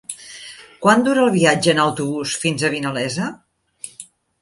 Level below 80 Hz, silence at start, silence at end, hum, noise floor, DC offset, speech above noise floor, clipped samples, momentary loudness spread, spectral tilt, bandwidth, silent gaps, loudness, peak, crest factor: -60 dBFS; 0.1 s; 0.4 s; none; -43 dBFS; under 0.1%; 26 dB; under 0.1%; 21 LU; -4.5 dB/octave; 11.5 kHz; none; -18 LUFS; 0 dBFS; 18 dB